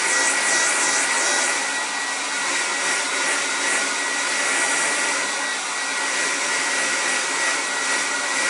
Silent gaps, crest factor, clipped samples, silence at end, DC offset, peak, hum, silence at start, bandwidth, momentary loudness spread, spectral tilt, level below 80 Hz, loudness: none; 14 dB; under 0.1%; 0 s; under 0.1%; -8 dBFS; none; 0 s; 16 kHz; 5 LU; 1.5 dB/octave; -82 dBFS; -20 LUFS